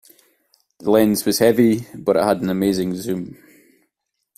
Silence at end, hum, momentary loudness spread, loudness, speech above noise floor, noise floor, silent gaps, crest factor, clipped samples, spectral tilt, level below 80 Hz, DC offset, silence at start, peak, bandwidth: 1.05 s; none; 12 LU; -18 LUFS; 58 dB; -76 dBFS; none; 18 dB; under 0.1%; -5.5 dB/octave; -56 dBFS; under 0.1%; 0.8 s; -2 dBFS; 16 kHz